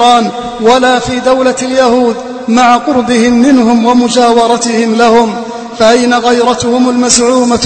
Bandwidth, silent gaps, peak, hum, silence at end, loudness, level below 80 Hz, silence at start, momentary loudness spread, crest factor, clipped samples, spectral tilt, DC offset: 11 kHz; none; 0 dBFS; none; 0 s; -8 LUFS; -40 dBFS; 0 s; 5 LU; 8 dB; 1%; -3.5 dB/octave; under 0.1%